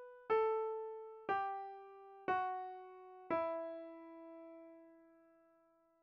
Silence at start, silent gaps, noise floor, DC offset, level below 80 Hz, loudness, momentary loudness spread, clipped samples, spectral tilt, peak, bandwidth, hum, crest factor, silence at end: 0 s; none; -73 dBFS; under 0.1%; -82 dBFS; -41 LUFS; 20 LU; under 0.1%; -3 dB/octave; -26 dBFS; 5.6 kHz; none; 18 dB; 0.9 s